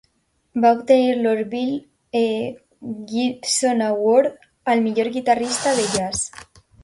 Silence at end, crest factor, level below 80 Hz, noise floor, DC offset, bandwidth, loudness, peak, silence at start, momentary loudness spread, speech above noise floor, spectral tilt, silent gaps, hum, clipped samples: 0.4 s; 18 dB; -56 dBFS; -65 dBFS; under 0.1%; 11.5 kHz; -20 LUFS; -4 dBFS; 0.55 s; 13 LU; 46 dB; -3.5 dB/octave; none; none; under 0.1%